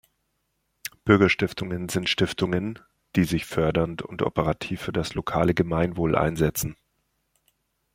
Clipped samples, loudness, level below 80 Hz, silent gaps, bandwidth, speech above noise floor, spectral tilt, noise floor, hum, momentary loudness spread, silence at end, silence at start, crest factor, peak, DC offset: under 0.1%; -25 LUFS; -48 dBFS; none; 16.5 kHz; 51 dB; -5.5 dB/octave; -75 dBFS; none; 10 LU; 1.2 s; 0.85 s; 22 dB; -4 dBFS; under 0.1%